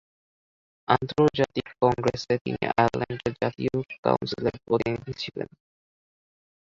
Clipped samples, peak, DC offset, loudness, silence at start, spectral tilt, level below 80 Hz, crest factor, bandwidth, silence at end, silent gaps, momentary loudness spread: under 0.1%; -6 dBFS; under 0.1%; -26 LUFS; 0.9 s; -6.5 dB/octave; -54 dBFS; 22 dB; 7.8 kHz; 1.3 s; 2.41-2.45 s, 3.98-4.03 s; 10 LU